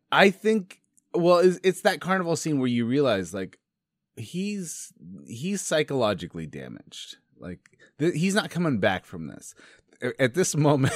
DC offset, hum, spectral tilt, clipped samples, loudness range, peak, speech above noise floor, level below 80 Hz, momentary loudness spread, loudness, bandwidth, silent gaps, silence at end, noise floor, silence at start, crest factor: under 0.1%; none; -5 dB/octave; under 0.1%; 6 LU; -2 dBFS; 59 dB; -66 dBFS; 22 LU; -25 LUFS; 15.5 kHz; none; 0 s; -84 dBFS; 0.1 s; 24 dB